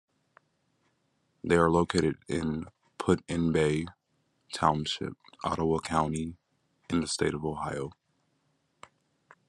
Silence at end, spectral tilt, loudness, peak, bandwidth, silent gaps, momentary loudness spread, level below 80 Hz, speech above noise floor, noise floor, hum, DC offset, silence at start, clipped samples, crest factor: 1.55 s; -5.5 dB/octave; -29 LUFS; -8 dBFS; 11.5 kHz; none; 14 LU; -56 dBFS; 46 dB; -74 dBFS; none; under 0.1%; 1.45 s; under 0.1%; 24 dB